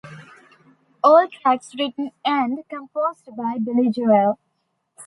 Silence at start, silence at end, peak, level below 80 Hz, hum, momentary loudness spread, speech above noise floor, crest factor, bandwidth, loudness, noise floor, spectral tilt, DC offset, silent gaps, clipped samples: 0.05 s; 0 s; -2 dBFS; -72 dBFS; none; 15 LU; 53 dB; 18 dB; 11.5 kHz; -20 LUFS; -72 dBFS; -6 dB/octave; under 0.1%; none; under 0.1%